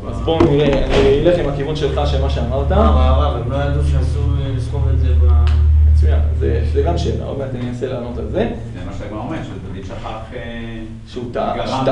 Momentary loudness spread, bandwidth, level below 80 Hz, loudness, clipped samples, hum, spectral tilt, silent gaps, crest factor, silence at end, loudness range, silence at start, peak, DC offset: 15 LU; 8.2 kHz; -20 dBFS; -17 LUFS; under 0.1%; none; -8 dB/octave; none; 14 dB; 0 s; 10 LU; 0 s; 0 dBFS; under 0.1%